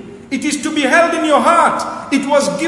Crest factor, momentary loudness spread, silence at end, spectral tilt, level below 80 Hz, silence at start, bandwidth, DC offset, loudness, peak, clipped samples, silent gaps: 14 dB; 9 LU; 0 s; -3 dB/octave; -54 dBFS; 0 s; 11.5 kHz; under 0.1%; -14 LUFS; 0 dBFS; under 0.1%; none